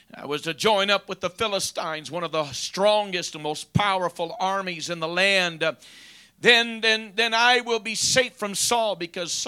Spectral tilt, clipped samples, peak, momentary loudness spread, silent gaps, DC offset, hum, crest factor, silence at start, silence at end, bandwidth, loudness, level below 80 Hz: -2 dB/octave; under 0.1%; -2 dBFS; 12 LU; none; under 0.1%; none; 22 dB; 0.15 s; 0 s; 16.5 kHz; -23 LUFS; -60 dBFS